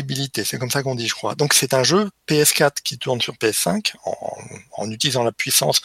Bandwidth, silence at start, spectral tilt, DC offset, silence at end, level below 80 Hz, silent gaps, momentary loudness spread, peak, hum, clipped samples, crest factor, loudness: 16.5 kHz; 0 s; -3 dB/octave; under 0.1%; 0.05 s; -60 dBFS; none; 14 LU; -2 dBFS; none; under 0.1%; 20 dB; -19 LUFS